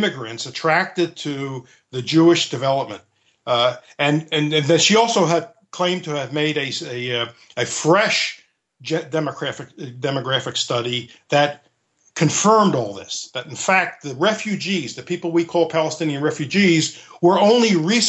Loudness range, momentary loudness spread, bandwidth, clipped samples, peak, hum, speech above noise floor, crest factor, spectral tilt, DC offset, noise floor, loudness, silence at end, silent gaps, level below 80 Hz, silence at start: 4 LU; 13 LU; 8.6 kHz; under 0.1%; -2 dBFS; none; 42 dB; 16 dB; -4 dB/octave; under 0.1%; -62 dBFS; -19 LUFS; 0 s; none; -68 dBFS; 0 s